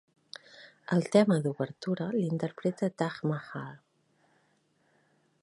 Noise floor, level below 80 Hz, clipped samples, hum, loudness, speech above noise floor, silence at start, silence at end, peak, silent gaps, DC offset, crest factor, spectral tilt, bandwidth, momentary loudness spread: -71 dBFS; -76 dBFS; under 0.1%; none; -30 LUFS; 41 dB; 0.6 s; 1.65 s; -10 dBFS; none; under 0.1%; 22 dB; -7 dB/octave; 11.5 kHz; 23 LU